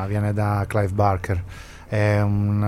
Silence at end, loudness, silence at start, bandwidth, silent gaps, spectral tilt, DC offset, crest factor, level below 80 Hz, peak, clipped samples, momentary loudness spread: 0 s; -22 LUFS; 0 s; 12 kHz; none; -8 dB/octave; under 0.1%; 16 dB; -42 dBFS; -6 dBFS; under 0.1%; 8 LU